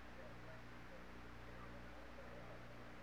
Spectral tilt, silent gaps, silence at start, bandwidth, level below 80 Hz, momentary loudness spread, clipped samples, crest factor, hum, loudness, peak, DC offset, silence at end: -5.5 dB/octave; none; 0 s; 15.5 kHz; -64 dBFS; 1 LU; under 0.1%; 12 dB; 60 Hz at -60 dBFS; -57 LUFS; -42 dBFS; 0.1%; 0 s